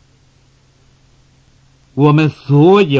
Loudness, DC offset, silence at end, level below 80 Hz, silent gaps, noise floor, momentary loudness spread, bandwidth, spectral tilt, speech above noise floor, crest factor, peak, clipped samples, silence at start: -11 LUFS; under 0.1%; 0 s; -54 dBFS; none; -51 dBFS; 7 LU; 7.4 kHz; -8.5 dB/octave; 42 dB; 14 dB; 0 dBFS; under 0.1%; 1.95 s